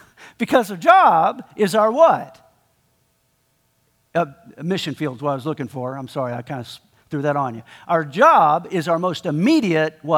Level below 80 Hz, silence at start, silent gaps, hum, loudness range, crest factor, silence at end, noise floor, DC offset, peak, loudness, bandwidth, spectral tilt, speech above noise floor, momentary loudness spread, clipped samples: -66 dBFS; 0.2 s; none; none; 9 LU; 18 dB; 0 s; -65 dBFS; under 0.1%; 0 dBFS; -19 LUFS; 17 kHz; -6 dB/octave; 47 dB; 16 LU; under 0.1%